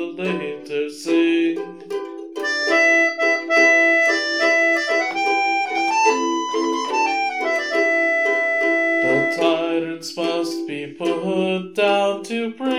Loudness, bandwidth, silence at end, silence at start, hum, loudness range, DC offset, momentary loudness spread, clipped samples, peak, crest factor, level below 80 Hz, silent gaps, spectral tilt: -18 LUFS; 13.5 kHz; 0 s; 0 s; none; 5 LU; 0.2%; 11 LU; under 0.1%; -4 dBFS; 16 dB; -78 dBFS; none; -3.5 dB/octave